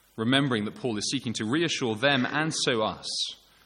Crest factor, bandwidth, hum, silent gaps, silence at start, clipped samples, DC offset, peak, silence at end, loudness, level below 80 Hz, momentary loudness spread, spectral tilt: 20 dB; 12 kHz; none; none; 0.15 s; under 0.1%; under 0.1%; -6 dBFS; 0.3 s; -27 LUFS; -66 dBFS; 6 LU; -4 dB/octave